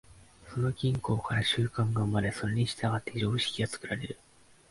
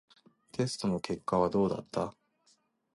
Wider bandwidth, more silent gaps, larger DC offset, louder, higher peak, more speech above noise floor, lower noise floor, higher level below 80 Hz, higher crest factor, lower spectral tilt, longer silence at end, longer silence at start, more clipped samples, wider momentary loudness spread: about the same, 11.5 kHz vs 11.5 kHz; neither; neither; about the same, -31 LUFS vs -32 LUFS; about the same, -16 dBFS vs -14 dBFS; second, 22 dB vs 40 dB; second, -52 dBFS vs -71 dBFS; first, -54 dBFS vs -62 dBFS; about the same, 16 dB vs 20 dB; about the same, -5.5 dB/octave vs -6 dB/octave; second, 0.55 s vs 0.85 s; second, 0.1 s vs 0.55 s; neither; about the same, 8 LU vs 8 LU